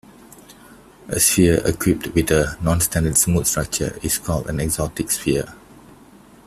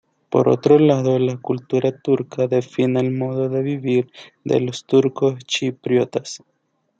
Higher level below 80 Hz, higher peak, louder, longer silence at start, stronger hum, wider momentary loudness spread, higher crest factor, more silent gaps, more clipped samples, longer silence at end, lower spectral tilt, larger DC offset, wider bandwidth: first, -38 dBFS vs -64 dBFS; about the same, -2 dBFS vs -2 dBFS; about the same, -19 LUFS vs -19 LUFS; first, 0.5 s vs 0.3 s; neither; about the same, 8 LU vs 9 LU; about the same, 20 dB vs 18 dB; neither; neither; about the same, 0.5 s vs 0.6 s; second, -4 dB/octave vs -6.5 dB/octave; neither; first, 16 kHz vs 8 kHz